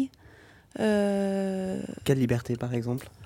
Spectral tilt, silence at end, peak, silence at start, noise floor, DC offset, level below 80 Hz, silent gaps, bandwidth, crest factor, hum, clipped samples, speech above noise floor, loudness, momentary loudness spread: -7 dB/octave; 0 s; -10 dBFS; 0 s; -54 dBFS; under 0.1%; -56 dBFS; none; 17 kHz; 18 dB; none; under 0.1%; 26 dB; -28 LUFS; 8 LU